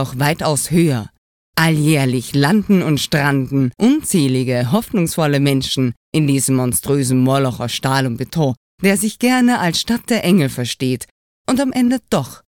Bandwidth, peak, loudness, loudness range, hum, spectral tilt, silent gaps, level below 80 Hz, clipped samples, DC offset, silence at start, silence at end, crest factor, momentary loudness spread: 18 kHz; 0 dBFS; -16 LUFS; 1 LU; none; -5 dB/octave; 1.18-1.53 s, 5.97-6.12 s, 8.57-8.78 s, 11.11-11.45 s; -48 dBFS; under 0.1%; under 0.1%; 0 s; 0.15 s; 16 dB; 6 LU